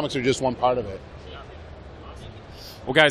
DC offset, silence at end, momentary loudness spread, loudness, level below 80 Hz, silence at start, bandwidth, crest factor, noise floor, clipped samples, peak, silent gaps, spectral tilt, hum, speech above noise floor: under 0.1%; 0 s; 19 LU; -23 LUFS; -46 dBFS; 0 s; 14.5 kHz; 22 dB; -41 dBFS; under 0.1%; -2 dBFS; none; -4.5 dB/octave; none; 19 dB